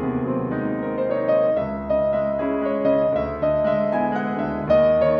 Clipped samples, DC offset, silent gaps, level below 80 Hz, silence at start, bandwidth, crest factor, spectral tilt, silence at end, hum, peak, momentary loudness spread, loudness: under 0.1%; under 0.1%; none; -44 dBFS; 0 s; 5.4 kHz; 14 dB; -9.5 dB/octave; 0 s; none; -6 dBFS; 6 LU; -22 LUFS